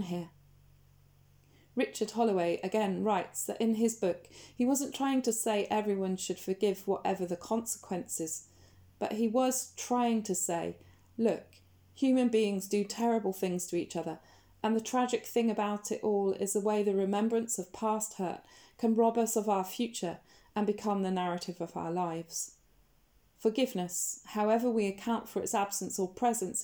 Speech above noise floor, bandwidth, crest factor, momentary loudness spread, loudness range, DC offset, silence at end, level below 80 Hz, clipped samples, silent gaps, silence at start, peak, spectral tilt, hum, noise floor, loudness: 36 dB; over 20 kHz; 16 dB; 9 LU; 3 LU; under 0.1%; 0 s; -72 dBFS; under 0.1%; none; 0 s; -16 dBFS; -4.5 dB/octave; none; -67 dBFS; -32 LUFS